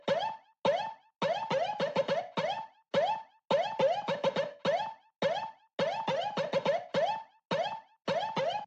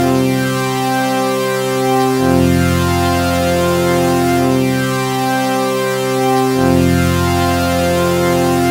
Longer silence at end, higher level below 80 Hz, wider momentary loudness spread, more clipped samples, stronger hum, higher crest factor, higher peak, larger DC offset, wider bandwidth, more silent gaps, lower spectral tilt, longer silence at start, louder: about the same, 0 s vs 0 s; second, -78 dBFS vs -36 dBFS; first, 7 LU vs 4 LU; neither; neither; about the same, 16 dB vs 14 dB; second, -16 dBFS vs 0 dBFS; neither; second, 8.2 kHz vs 16 kHz; neither; about the same, -5 dB/octave vs -5.5 dB/octave; about the same, 0.05 s vs 0 s; second, -33 LUFS vs -14 LUFS